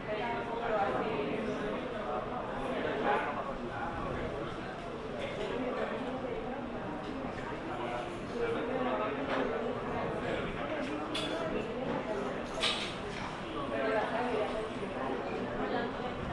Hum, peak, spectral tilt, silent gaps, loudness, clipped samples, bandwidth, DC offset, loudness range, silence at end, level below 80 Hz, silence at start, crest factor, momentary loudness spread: none; -18 dBFS; -5.5 dB/octave; none; -35 LUFS; under 0.1%; 11.5 kHz; under 0.1%; 3 LU; 0 s; -54 dBFS; 0 s; 16 dB; 7 LU